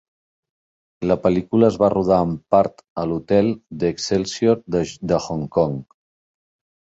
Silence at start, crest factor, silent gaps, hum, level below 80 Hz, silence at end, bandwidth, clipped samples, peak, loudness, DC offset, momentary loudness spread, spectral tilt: 1 s; 20 dB; 2.90-2.96 s; none; -48 dBFS; 1 s; 8 kHz; under 0.1%; 0 dBFS; -20 LUFS; under 0.1%; 8 LU; -6.5 dB/octave